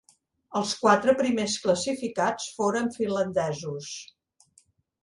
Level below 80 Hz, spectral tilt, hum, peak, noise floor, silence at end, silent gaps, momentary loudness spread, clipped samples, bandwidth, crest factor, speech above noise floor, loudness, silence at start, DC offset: -64 dBFS; -4 dB/octave; none; -6 dBFS; -64 dBFS; 1 s; none; 13 LU; under 0.1%; 11.5 kHz; 22 dB; 38 dB; -26 LUFS; 0.5 s; under 0.1%